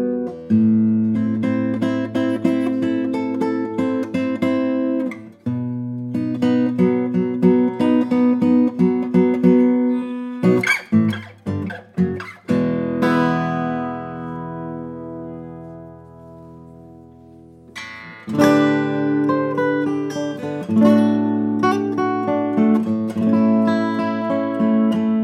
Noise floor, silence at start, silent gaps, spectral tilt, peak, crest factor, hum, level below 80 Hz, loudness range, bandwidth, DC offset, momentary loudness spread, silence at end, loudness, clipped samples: -44 dBFS; 0 s; none; -7.5 dB/octave; -2 dBFS; 18 dB; none; -64 dBFS; 9 LU; 12 kHz; under 0.1%; 14 LU; 0 s; -19 LUFS; under 0.1%